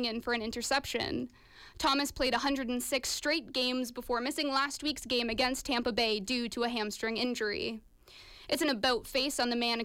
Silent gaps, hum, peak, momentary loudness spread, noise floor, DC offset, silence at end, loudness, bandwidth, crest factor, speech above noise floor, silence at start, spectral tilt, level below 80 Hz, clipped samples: none; none; -18 dBFS; 6 LU; -55 dBFS; under 0.1%; 0 s; -32 LUFS; 17 kHz; 14 dB; 22 dB; 0 s; -2.5 dB/octave; -56 dBFS; under 0.1%